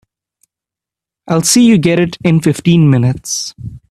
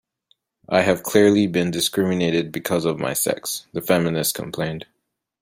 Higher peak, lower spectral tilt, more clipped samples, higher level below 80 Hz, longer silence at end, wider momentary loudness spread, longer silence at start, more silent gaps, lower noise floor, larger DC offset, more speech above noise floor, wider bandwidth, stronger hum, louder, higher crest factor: about the same, 0 dBFS vs -2 dBFS; about the same, -5 dB/octave vs -4.5 dB/octave; neither; first, -46 dBFS vs -58 dBFS; second, 0.15 s vs 0.6 s; about the same, 11 LU vs 11 LU; first, 1.25 s vs 0.7 s; neither; first, -86 dBFS vs -65 dBFS; neither; first, 75 dB vs 45 dB; second, 14 kHz vs 16 kHz; neither; first, -11 LUFS vs -21 LUFS; second, 12 dB vs 20 dB